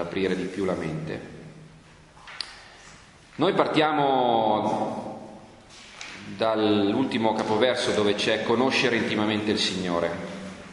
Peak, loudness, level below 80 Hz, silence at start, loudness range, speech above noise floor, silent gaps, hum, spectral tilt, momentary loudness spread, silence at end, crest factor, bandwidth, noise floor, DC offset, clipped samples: -4 dBFS; -24 LUFS; -58 dBFS; 0 s; 7 LU; 27 dB; none; none; -5 dB/octave; 17 LU; 0 s; 20 dB; 11.5 kHz; -51 dBFS; under 0.1%; under 0.1%